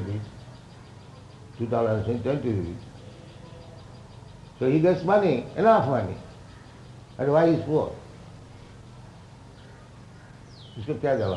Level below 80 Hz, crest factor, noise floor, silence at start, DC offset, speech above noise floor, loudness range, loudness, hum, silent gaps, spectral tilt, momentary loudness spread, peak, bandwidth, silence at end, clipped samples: -54 dBFS; 20 dB; -47 dBFS; 0 s; under 0.1%; 24 dB; 8 LU; -24 LUFS; none; none; -8 dB/octave; 26 LU; -8 dBFS; 11 kHz; 0 s; under 0.1%